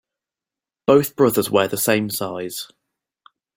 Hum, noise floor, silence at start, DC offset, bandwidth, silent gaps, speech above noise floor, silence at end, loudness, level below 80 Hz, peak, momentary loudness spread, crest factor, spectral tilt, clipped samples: none; -89 dBFS; 0.9 s; under 0.1%; 17 kHz; none; 70 dB; 0.9 s; -19 LUFS; -60 dBFS; -2 dBFS; 13 LU; 20 dB; -4.5 dB/octave; under 0.1%